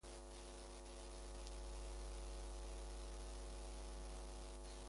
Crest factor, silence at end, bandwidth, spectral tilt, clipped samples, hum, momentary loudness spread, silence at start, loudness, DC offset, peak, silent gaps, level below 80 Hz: 16 dB; 0 s; 11.5 kHz; -4 dB/octave; under 0.1%; none; 3 LU; 0.05 s; -54 LUFS; under 0.1%; -36 dBFS; none; -52 dBFS